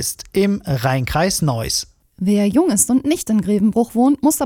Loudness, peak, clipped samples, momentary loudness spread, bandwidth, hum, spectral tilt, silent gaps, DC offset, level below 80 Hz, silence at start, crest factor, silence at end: -17 LUFS; -2 dBFS; under 0.1%; 6 LU; 18.5 kHz; none; -5 dB/octave; none; under 0.1%; -40 dBFS; 0 s; 14 dB; 0 s